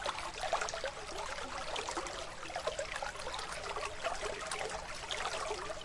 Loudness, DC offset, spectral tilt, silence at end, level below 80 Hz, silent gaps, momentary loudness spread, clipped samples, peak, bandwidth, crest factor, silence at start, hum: -39 LUFS; under 0.1%; -1.5 dB/octave; 0 s; -54 dBFS; none; 4 LU; under 0.1%; -20 dBFS; 12 kHz; 20 dB; 0 s; none